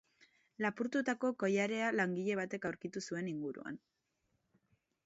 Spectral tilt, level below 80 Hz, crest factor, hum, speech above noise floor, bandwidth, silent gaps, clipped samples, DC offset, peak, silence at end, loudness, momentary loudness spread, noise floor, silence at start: -4.5 dB/octave; -82 dBFS; 18 dB; none; 45 dB; 8 kHz; none; under 0.1%; under 0.1%; -20 dBFS; 1.3 s; -37 LUFS; 10 LU; -82 dBFS; 0.6 s